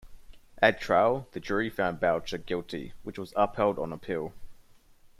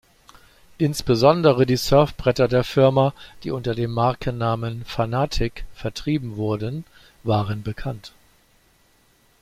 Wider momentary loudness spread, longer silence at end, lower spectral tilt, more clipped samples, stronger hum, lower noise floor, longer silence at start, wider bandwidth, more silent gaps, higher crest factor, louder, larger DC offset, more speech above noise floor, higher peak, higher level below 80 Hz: about the same, 14 LU vs 14 LU; second, 0.15 s vs 1.35 s; about the same, -6 dB/octave vs -6.5 dB/octave; neither; neither; about the same, -56 dBFS vs -59 dBFS; second, 0.05 s vs 0.8 s; about the same, 15 kHz vs 15.5 kHz; neither; about the same, 22 dB vs 20 dB; second, -29 LUFS vs -22 LUFS; neither; second, 28 dB vs 38 dB; second, -8 dBFS vs -2 dBFS; second, -54 dBFS vs -40 dBFS